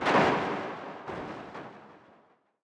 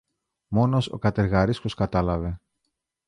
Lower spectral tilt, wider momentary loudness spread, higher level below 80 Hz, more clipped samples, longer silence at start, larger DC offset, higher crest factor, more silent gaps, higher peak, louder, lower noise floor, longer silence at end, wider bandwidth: second, -5.5 dB/octave vs -8 dB/octave; first, 21 LU vs 7 LU; second, -64 dBFS vs -40 dBFS; neither; second, 0 s vs 0.5 s; neither; about the same, 20 dB vs 18 dB; neither; second, -12 dBFS vs -6 dBFS; second, -31 LUFS vs -24 LUFS; second, -64 dBFS vs -79 dBFS; about the same, 0.65 s vs 0.7 s; about the same, 11 kHz vs 11 kHz